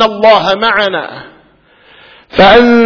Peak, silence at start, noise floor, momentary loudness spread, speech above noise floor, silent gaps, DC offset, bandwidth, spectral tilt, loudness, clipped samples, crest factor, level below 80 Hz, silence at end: 0 dBFS; 0 s; -46 dBFS; 17 LU; 38 dB; none; under 0.1%; 5.4 kHz; -5.5 dB/octave; -8 LUFS; 2%; 10 dB; -38 dBFS; 0 s